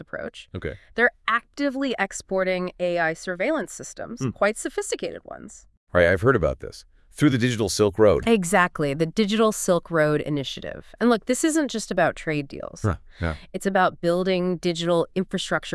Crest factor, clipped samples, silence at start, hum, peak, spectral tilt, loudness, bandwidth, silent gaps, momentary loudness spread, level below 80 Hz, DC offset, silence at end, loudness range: 20 dB; under 0.1%; 0 s; none; -4 dBFS; -5 dB/octave; -23 LUFS; 12 kHz; 5.77-5.87 s; 14 LU; -48 dBFS; under 0.1%; 0 s; 5 LU